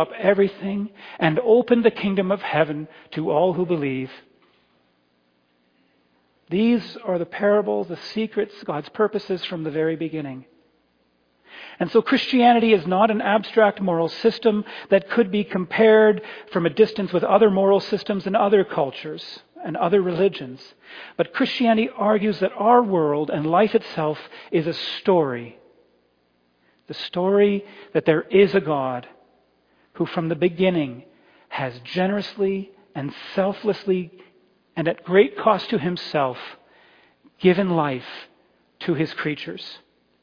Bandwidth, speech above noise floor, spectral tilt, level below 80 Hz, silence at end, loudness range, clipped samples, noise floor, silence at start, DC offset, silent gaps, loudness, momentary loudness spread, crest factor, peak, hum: 5.2 kHz; 44 dB; -8 dB/octave; -64 dBFS; 0.45 s; 7 LU; under 0.1%; -65 dBFS; 0 s; under 0.1%; none; -21 LUFS; 16 LU; 18 dB; -2 dBFS; none